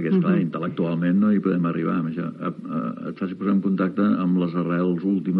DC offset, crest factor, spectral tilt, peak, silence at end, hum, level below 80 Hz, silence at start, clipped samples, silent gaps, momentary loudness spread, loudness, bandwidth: under 0.1%; 12 dB; -11 dB/octave; -10 dBFS; 0 s; none; -70 dBFS; 0 s; under 0.1%; none; 9 LU; -23 LUFS; 4.5 kHz